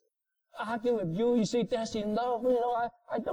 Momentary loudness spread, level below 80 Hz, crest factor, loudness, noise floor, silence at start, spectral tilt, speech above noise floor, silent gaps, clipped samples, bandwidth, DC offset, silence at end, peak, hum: 7 LU; -64 dBFS; 12 dB; -31 LUFS; -81 dBFS; 0.55 s; -6 dB/octave; 51 dB; none; under 0.1%; 11 kHz; under 0.1%; 0 s; -18 dBFS; none